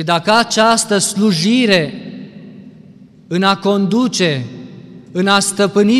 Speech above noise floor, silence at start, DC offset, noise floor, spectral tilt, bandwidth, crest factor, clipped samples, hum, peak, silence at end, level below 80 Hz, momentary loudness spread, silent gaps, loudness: 28 dB; 0 s; under 0.1%; -41 dBFS; -4 dB/octave; 14.5 kHz; 14 dB; under 0.1%; none; -2 dBFS; 0 s; -58 dBFS; 19 LU; none; -14 LUFS